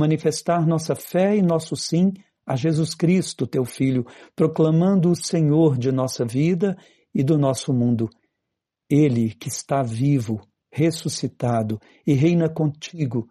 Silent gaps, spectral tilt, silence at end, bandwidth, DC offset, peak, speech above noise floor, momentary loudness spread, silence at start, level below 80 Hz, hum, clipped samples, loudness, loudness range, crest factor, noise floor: none; -6.5 dB/octave; 0.05 s; 13 kHz; under 0.1%; -8 dBFS; 61 dB; 9 LU; 0 s; -60 dBFS; none; under 0.1%; -21 LUFS; 3 LU; 14 dB; -82 dBFS